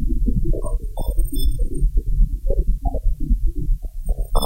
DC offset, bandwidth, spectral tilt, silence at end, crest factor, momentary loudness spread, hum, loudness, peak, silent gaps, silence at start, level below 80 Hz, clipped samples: under 0.1%; 15 kHz; -7.5 dB/octave; 0 s; 16 dB; 5 LU; none; -25 LUFS; -2 dBFS; none; 0 s; -18 dBFS; under 0.1%